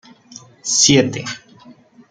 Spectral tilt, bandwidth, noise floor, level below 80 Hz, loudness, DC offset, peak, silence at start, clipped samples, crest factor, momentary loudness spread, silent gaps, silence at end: -3 dB/octave; 10.5 kHz; -45 dBFS; -54 dBFS; -14 LUFS; under 0.1%; -2 dBFS; 0.35 s; under 0.1%; 18 dB; 18 LU; none; 0.4 s